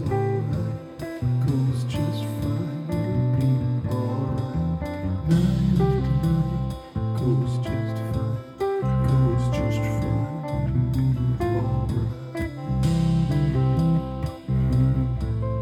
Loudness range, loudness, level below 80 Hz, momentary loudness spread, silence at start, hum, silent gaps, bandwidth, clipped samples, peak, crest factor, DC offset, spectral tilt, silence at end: 2 LU; -24 LUFS; -36 dBFS; 7 LU; 0 s; none; none; 13 kHz; under 0.1%; -8 dBFS; 14 dB; under 0.1%; -8.5 dB/octave; 0 s